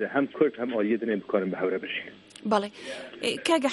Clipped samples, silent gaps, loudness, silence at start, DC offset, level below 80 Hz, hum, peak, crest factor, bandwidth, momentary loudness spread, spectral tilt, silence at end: under 0.1%; none; -28 LUFS; 0 s; under 0.1%; -72 dBFS; none; -8 dBFS; 20 dB; 11.5 kHz; 12 LU; -4.5 dB/octave; 0 s